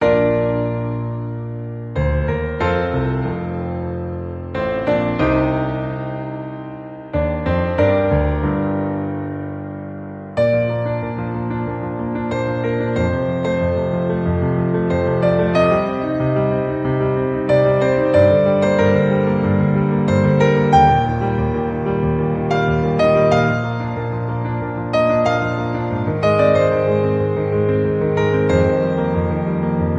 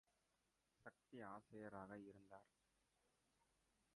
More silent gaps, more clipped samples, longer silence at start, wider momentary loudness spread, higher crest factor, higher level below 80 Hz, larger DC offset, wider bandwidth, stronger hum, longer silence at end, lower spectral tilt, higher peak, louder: neither; neither; second, 0 s vs 0.8 s; about the same, 11 LU vs 10 LU; second, 16 dB vs 22 dB; first, -32 dBFS vs -88 dBFS; neither; second, 8.6 kHz vs 11 kHz; neither; second, 0 s vs 1.5 s; first, -8.5 dB/octave vs -6.5 dB/octave; first, 0 dBFS vs -42 dBFS; first, -18 LUFS vs -60 LUFS